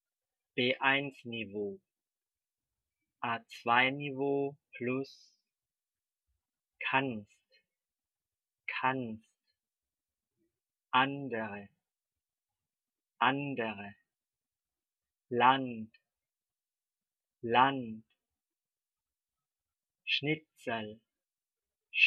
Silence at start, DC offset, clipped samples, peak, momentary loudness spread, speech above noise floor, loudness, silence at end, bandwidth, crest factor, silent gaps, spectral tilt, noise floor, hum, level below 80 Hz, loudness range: 0.55 s; under 0.1%; under 0.1%; -12 dBFS; 18 LU; over 57 dB; -33 LUFS; 0 s; 7 kHz; 26 dB; none; -2 dB/octave; under -90 dBFS; none; -84 dBFS; 6 LU